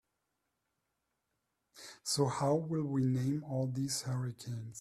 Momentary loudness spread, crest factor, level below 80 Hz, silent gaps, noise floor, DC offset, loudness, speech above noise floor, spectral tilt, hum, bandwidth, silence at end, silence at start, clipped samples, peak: 11 LU; 20 dB; -72 dBFS; none; -84 dBFS; under 0.1%; -35 LUFS; 50 dB; -5.5 dB/octave; none; 14.5 kHz; 0 s; 1.75 s; under 0.1%; -18 dBFS